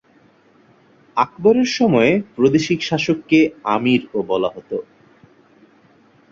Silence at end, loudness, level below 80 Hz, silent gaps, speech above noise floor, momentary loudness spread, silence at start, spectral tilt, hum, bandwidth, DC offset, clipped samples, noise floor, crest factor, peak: 1.5 s; -18 LUFS; -56 dBFS; none; 36 dB; 8 LU; 1.15 s; -5.5 dB/octave; none; 7.6 kHz; under 0.1%; under 0.1%; -53 dBFS; 18 dB; -2 dBFS